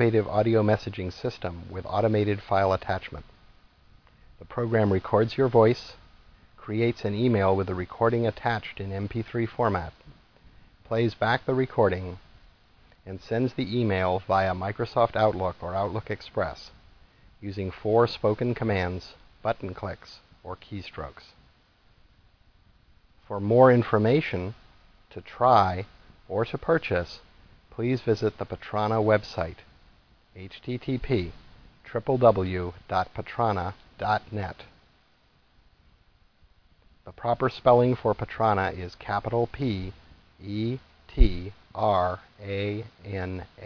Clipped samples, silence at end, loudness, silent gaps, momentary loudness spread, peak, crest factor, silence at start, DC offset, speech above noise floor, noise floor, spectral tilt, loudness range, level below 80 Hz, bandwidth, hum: under 0.1%; 0 s; -26 LUFS; none; 17 LU; -4 dBFS; 22 dB; 0 s; under 0.1%; 37 dB; -63 dBFS; -8 dB/octave; 7 LU; -42 dBFS; 5.4 kHz; none